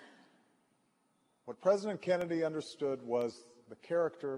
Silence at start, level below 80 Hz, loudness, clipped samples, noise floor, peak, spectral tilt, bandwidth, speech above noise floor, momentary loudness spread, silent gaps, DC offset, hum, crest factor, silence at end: 0 s; -82 dBFS; -35 LUFS; under 0.1%; -75 dBFS; -16 dBFS; -6 dB/octave; 11.5 kHz; 41 dB; 20 LU; none; under 0.1%; none; 20 dB; 0 s